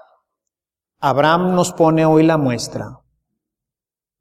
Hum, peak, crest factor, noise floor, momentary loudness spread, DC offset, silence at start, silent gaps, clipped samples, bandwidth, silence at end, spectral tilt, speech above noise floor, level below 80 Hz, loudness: none; -2 dBFS; 18 dB; -90 dBFS; 13 LU; under 0.1%; 1 s; none; under 0.1%; 15 kHz; 1.25 s; -6 dB/octave; 75 dB; -54 dBFS; -16 LUFS